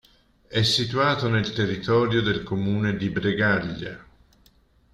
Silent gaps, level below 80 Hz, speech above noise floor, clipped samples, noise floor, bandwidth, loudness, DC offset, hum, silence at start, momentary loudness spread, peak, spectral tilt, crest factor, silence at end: none; -52 dBFS; 36 dB; under 0.1%; -59 dBFS; 12.5 kHz; -23 LUFS; under 0.1%; none; 0.5 s; 9 LU; -8 dBFS; -5.5 dB/octave; 16 dB; 0.9 s